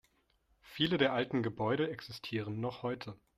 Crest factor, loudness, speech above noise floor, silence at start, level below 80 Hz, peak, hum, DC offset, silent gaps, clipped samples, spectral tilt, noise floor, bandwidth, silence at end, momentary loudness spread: 22 dB; -35 LUFS; 39 dB; 0.65 s; -68 dBFS; -14 dBFS; none; under 0.1%; none; under 0.1%; -6.5 dB/octave; -74 dBFS; 14.5 kHz; 0.25 s; 11 LU